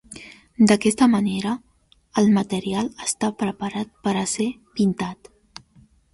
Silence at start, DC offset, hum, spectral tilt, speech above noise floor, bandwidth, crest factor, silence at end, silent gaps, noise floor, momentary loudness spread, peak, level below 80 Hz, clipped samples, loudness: 0.1 s; under 0.1%; none; -5 dB/octave; 34 dB; 11.5 kHz; 18 dB; 1 s; none; -55 dBFS; 13 LU; -4 dBFS; -56 dBFS; under 0.1%; -22 LUFS